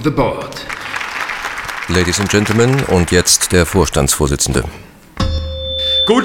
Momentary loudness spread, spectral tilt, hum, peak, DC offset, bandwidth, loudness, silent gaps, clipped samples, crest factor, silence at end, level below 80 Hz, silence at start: 11 LU; -3.5 dB/octave; none; 0 dBFS; under 0.1%; 17.5 kHz; -15 LUFS; none; under 0.1%; 16 dB; 0 s; -30 dBFS; 0 s